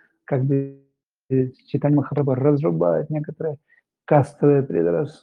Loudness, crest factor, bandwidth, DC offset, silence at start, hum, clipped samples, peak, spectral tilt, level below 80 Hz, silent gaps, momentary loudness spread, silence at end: -21 LUFS; 18 dB; 9.6 kHz; under 0.1%; 0.3 s; none; under 0.1%; -2 dBFS; -10.5 dB/octave; -64 dBFS; 1.03-1.07 s; 10 LU; 0.1 s